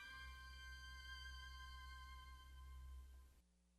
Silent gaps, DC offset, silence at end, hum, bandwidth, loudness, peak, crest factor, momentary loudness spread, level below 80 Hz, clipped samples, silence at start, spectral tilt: none; under 0.1%; 0 s; none; 13 kHz; -58 LUFS; -44 dBFS; 14 dB; 7 LU; -60 dBFS; under 0.1%; 0 s; -2.5 dB/octave